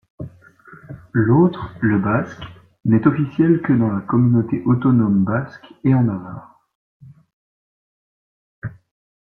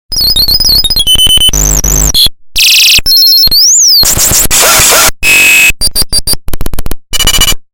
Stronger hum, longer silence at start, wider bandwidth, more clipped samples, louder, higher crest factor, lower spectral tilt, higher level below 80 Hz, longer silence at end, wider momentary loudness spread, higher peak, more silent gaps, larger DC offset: neither; about the same, 0.2 s vs 0.1 s; second, 4.3 kHz vs over 20 kHz; second, under 0.1% vs 1%; second, -18 LUFS vs -3 LUFS; first, 18 dB vs 6 dB; first, -10.5 dB/octave vs 0 dB/octave; second, -52 dBFS vs -16 dBFS; first, 0.7 s vs 0.15 s; first, 21 LU vs 8 LU; about the same, -2 dBFS vs 0 dBFS; first, 6.75-7.00 s, 7.33-8.62 s vs none; neither